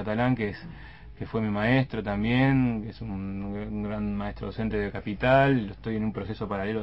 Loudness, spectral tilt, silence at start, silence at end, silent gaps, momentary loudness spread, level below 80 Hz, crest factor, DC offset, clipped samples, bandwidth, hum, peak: -27 LUFS; -9.5 dB/octave; 0 s; 0 s; none; 12 LU; -44 dBFS; 18 dB; 0.2%; under 0.1%; 5.8 kHz; none; -8 dBFS